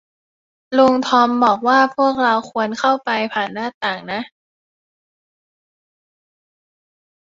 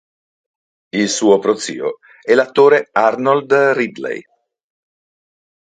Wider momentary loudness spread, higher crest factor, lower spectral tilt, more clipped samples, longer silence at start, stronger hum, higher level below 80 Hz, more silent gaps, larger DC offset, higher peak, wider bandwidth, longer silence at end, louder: second, 11 LU vs 14 LU; about the same, 18 dB vs 16 dB; about the same, -4.5 dB/octave vs -4 dB/octave; neither; second, 0.7 s vs 0.95 s; neither; about the same, -64 dBFS vs -66 dBFS; first, 3.74-3.81 s vs none; neither; about the same, -2 dBFS vs 0 dBFS; second, 7.8 kHz vs 9.4 kHz; first, 2.95 s vs 1.55 s; about the same, -17 LUFS vs -15 LUFS